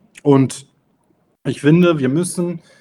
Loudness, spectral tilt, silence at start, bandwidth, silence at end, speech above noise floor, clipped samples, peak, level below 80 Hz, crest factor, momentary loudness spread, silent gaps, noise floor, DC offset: -16 LUFS; -6.5 dB/octave; 0.25 s; 12.5 kHz; 0.2 s; 46 dB; under 0.1%; 0 dBFS; -60 dBFS; 16 dB; 13 LU; none; -61 dBFS; under 0.1%